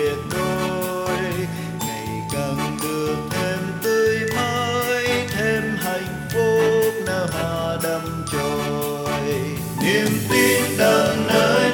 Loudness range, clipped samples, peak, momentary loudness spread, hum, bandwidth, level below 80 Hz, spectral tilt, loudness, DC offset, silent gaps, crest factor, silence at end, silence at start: 4 LU; under 0.1%; -4 dBFS; 8 LU; none; over 20 kHz; -48 dBFS; -4.5 dB/octave; -21 LUFS; under 0.1%; none; 18 dB; 0 s; 0 s